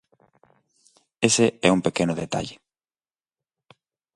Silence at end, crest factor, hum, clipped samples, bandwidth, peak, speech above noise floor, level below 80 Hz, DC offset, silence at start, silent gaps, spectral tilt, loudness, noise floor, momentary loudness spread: 1.6 s; 26 dB; none; under 0.1%; 11.5 kHz; -2 dBFS; over 68 dB; -58 dBFS; under 0.1%; 1.2 s; none; -4 dB/octave; -22 LUFS; under -90 dBFS; 11 LU